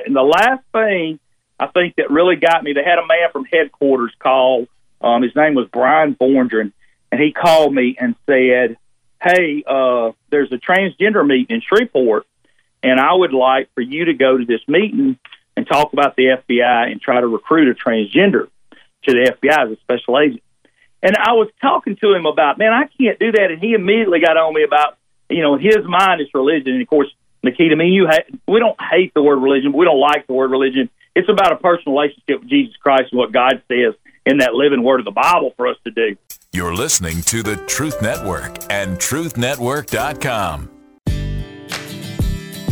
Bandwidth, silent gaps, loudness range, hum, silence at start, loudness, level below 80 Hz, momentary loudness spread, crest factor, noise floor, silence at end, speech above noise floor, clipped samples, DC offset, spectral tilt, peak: over 20 kHz; none; 5 LU; none; 0 s; -15 LUFS; -40 dBFS; 9 LU; 14 dB; -61 dBFS; 0 s; 47 dB; under 0.1%; under 0.1%; -4.5 dB/octave; -2 dBFS